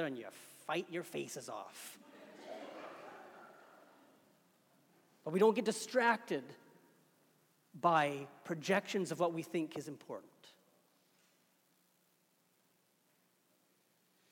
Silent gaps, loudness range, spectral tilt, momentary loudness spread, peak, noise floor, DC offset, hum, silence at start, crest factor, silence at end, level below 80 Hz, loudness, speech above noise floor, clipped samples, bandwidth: none; 17 LU; -4.5 dB/octave; 22 LU; -18 dBFS; -75 dBFS; under 0.1%; none; 0 s; 24 dB; 3.8 s; under -90 dBFS; -37 LUFS; 39 dB; under 0.1%; 17.5 kHz